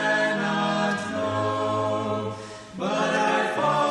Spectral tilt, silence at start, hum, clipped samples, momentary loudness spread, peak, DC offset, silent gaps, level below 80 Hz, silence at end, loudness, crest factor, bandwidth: -5 dB/octave; 0 s; none; under 0.1%; 9 LU; -12 dBFS; under 0.1%; none; -62 dBFS; 0 s; -25 LUFS; 12 dB; 11.5 kHz